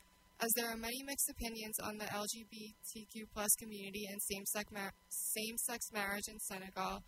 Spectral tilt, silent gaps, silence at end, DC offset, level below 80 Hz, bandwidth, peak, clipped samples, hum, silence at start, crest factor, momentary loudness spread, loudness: -1.5 dB/octave; none; 0 s; under 0.1%; -64 dBFS; 16 kHz; -18 dBFS; under 0.1%; none; 0.4 s; 26 dB; 12 LU; -40 LUFS